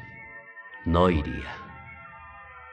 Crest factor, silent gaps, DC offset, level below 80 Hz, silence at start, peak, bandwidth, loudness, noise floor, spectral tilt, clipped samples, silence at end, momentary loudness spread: 22 dB; none; under 0.1%; -44 dBFS; 0 s; -8 dBFS; 8.6 kHz; -26 LUFS; -46 dBFS; -8 dB/octave; under 0.1%; 0 s; 22 LU